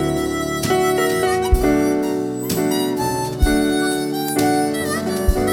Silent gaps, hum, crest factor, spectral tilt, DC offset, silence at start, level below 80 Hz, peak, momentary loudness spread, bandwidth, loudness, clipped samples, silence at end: none; none; 16 dB; -5 dB/octave; under 0.1%; 0 s; -26 dBFS; -4 dBFS; 4 LU; over 20 kHz; -19 LUFS; under 0.1%; 0 s